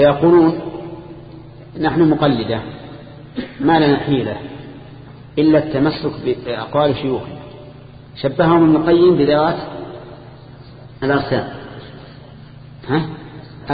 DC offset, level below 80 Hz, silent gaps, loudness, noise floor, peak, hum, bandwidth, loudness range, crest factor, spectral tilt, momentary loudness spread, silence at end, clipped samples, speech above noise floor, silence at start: under 0.1%; -44 dBFS; none; -16 LUFS; -38 dBFS; 0 dBFS; none; 5 kHz; 8 LU; 16 dB; -12 dB/octave; 24 LU; 0 s; under 0.1%; 23 dB; 0 s